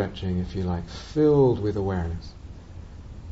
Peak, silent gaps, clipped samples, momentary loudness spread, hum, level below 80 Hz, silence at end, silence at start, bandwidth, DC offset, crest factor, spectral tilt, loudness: -10 dBFS; none; under 0.1%; 23 LU; none; -40 dBFS; 0 s; 0 s; 8 kHz; under 0.1%; 16 dB; -8.5 dB/octave; -25 LUFS